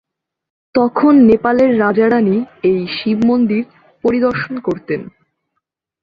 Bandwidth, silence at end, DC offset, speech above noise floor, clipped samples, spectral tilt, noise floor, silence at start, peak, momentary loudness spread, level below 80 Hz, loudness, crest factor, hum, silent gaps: 5.4 kHz; 0.95 s; under 0.1%; 61 dB; under 0.1%; -8.5 dB/octave; -74 dBFS; 0.75 s; -2 dBFS; 11 LU; -52 dBFS; -14 LUFS; 14 dB; none; none